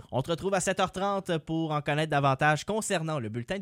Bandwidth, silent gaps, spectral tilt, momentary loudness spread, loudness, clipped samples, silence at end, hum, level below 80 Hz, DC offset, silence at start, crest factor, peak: 16 kHz; none; -5 dB/octave; 6 LU; -28 LUFS; under 0.1%; 0 s; none; -58 dBFS; under 0.1%; 0.05 s; 16 dB; -12 dBFS